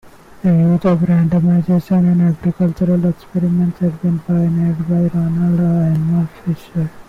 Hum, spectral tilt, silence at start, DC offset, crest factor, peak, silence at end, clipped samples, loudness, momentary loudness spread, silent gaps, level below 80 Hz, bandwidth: none; -10.5 dB/octave; 0.05 s; under 0.1%; 8 dB; -8 dBFS; 0.05 s; under 0.1%; -16 LUFS; 6 LU; none; -44 dBFS; 4.2 kHz